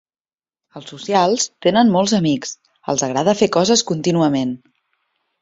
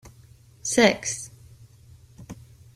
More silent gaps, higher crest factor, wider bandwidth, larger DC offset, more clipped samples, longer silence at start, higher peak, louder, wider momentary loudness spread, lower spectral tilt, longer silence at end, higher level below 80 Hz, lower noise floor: neither; second, 16 dB vs 26 dB; second, 8 kHz vs 16 kHz; neither; neither; first, 0.75 s vs 0.05 s; about the same, -2 dBFS vs -2 dBFS; first, -17 LUFS vs -23 LUFS; second, 17 LU vs 25 LU; first, -4.5 dB/octave vs -3 dB/octave; first, 0.85 s vs 0.4 s; about the same, -58 dBFS vs -58 dBFS; first, under -90 dBFS vs -52 dBFS